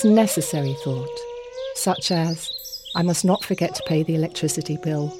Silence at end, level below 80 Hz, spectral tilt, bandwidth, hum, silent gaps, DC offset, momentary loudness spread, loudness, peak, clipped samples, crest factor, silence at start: 0 s; -58 dBFS; -5 dB/octave; 16.5 kHz; none; none; under 0.1%; 11 LU; -23 LUFS; -6 dBFS; under 0.1%; 18 dB; 0 s